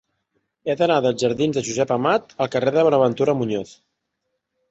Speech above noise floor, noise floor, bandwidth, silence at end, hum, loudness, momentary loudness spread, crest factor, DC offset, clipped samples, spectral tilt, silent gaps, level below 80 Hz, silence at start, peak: 57 dB; -77 dBFS; 8.2 kHz; 0.95 s; none; -20 LUFS; 9 LU; 18 dB; under 0.1%; under 0.1%; -5.5 dB/octave; none; -60 dBFS; 0.65 s; -4 dBFS